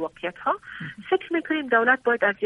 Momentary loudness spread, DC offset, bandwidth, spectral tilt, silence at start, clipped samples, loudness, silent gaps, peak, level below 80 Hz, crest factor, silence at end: 12 LU; under 0.1%; 10.5 kHz; -6.5 dB/octave; 0 s; under 0.1%; -24 LUFS; none; -6 dBFS; -66 dBFS; 18 dB; 0 s